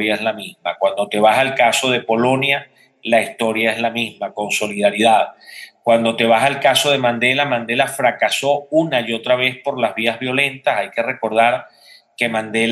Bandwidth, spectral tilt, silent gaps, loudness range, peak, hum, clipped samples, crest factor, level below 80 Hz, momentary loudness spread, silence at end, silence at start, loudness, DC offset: 16 kHz; -3.5 dB/octave; none; 3 LU; -2 dBFS; none; under 0.1%; 16 dB; -68 dBFS; 8 LU; 0 s; 0 s; -17 LUFS; under 0.1%